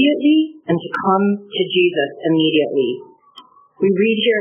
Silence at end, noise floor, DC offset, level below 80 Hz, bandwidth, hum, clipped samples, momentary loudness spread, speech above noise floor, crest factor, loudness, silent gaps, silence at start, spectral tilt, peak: 0 s; -46 dBFS; under 0.1%; -68 dBFS; 3.6 kHz; none; under 0.1%; 6 LU; 29 dB; 14 dB; -17 LUFS; none; 0 s; -4 dB/octave; -2 dBFS